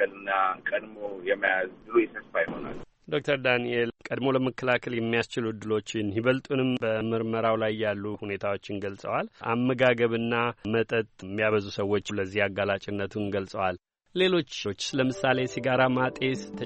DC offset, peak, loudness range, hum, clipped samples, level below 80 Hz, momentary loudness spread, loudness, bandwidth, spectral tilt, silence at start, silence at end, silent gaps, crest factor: under 0.1%; -8 dBFS; 2 LU; none; under 0.1%; -62 dBFS; 8 LU; -28 LUFS; 8.4 kHz; -5.5 dB/octave; 0 s; 0 s; none; 20 dB